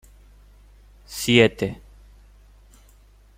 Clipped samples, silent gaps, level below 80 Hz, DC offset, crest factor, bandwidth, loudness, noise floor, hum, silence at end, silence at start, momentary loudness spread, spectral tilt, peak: under 0.1%; none; -48 dBFS; under 0.1%; 24 dB; 16.5 kHz; -20 LUFS; -52 dBFS; none; 1.65 s; 1.1 s; 21 LU; -4.5 dB/octave; -2 dBFS